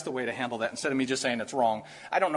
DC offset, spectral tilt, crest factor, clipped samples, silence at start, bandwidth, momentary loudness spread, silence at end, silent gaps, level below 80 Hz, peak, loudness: under 0.1%; -3.5 dB/octave; 18 dB; under 0.1%; 0 s; 11.5 kHz; 4 LU; 0 s; none; -72 dBFS; -12 dBFS; -30 LUFS